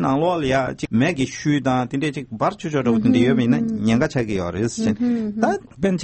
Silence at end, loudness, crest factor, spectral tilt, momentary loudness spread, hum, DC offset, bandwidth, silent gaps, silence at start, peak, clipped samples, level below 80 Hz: 0 s; -20 LUFS; 16 dB; -6.5 dB/octave; 7 LU; none; under 0.1%; 8.8 kHz; none; 0 s; -4 dBFS; under 0.1%; -48 dBFS